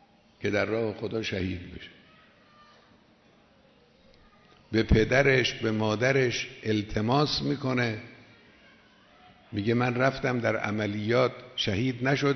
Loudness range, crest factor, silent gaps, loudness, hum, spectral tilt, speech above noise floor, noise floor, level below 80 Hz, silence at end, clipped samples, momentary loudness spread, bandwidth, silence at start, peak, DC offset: 11 LU; 22 dB; none; -27 LUFS; none; -5.5 dB/octave; 34 dB; -60 dBFS; -44 dBFS; 0 s; under 0.1%; 11 LU; 6.4 kHz; 0.4 s; -6 dBFS; under 0.1%